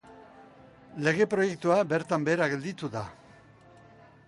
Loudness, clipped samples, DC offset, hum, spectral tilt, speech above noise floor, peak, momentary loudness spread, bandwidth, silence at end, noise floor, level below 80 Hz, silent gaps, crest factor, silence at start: -28 LUFS; under 0.1%; under 0.1%; none; -6 dB/octave; 27 dB; -12 dBFS; 12 LU; 11.5 kHz; 1.15 s; -55 dBFS; -66 dBFS; none; 18 dB; 0.05 s